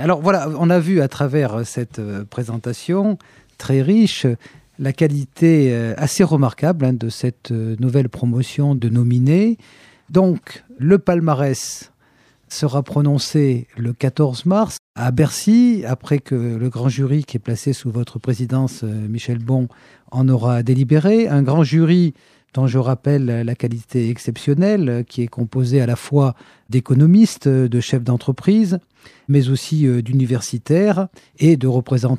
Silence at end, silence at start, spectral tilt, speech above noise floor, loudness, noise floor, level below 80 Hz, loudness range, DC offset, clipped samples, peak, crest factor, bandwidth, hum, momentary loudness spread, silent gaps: 0 s; 0 s; -7.5 dB/octave; 39 dB; -18 LUFS; -56 dBFS; -56 dBFS; 4 LU; under 0.1%; under 0.1%; -2 dBFS; 14 dB; 13.5 kHz; none; 10 LU; 14.79-14.94 s